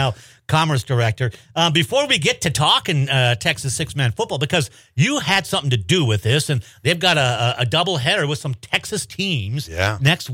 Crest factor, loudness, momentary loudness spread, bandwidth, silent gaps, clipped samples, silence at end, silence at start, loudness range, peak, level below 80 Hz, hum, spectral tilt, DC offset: 16 dB; -19 LUFS; 7 LU; 16.5 kHz; none; under 0.1%; 0 s; 0 s; 2 LU; -4 dBFS; -48 dBFS; none; -4 dB/octave; under 0.1%